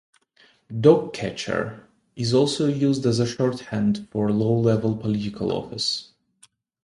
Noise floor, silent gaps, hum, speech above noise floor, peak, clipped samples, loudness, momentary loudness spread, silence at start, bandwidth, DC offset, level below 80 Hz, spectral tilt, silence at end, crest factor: -59 dBFS; none; none; 37 dB; -2 dBFS; under 0.1%; -23 LUFS; 10 LU; 0.7 s; 11.5 kHz; under 0.1%; -56 dBFS; -6 dB/octave; 0.8 s; 20 dB